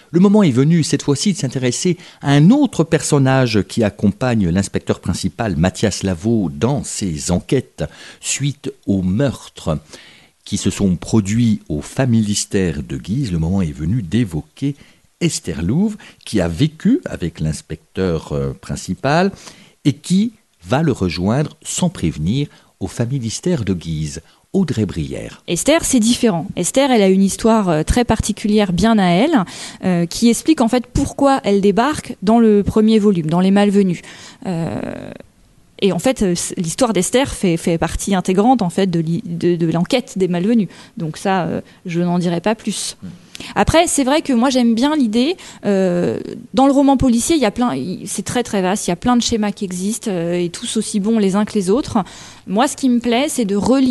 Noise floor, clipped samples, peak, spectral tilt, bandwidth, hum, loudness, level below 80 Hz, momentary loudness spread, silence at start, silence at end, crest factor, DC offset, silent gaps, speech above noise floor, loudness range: -51 dBFS; under 0.1%; 0 dBFS; -5.5 dB/octave; 12.5 kHz; none; -17 LUFS; -38 dBFS; 11 LU; 0.15 s; 0 s; 16 dB; under 0.1%; none; 34 dB; 6 LU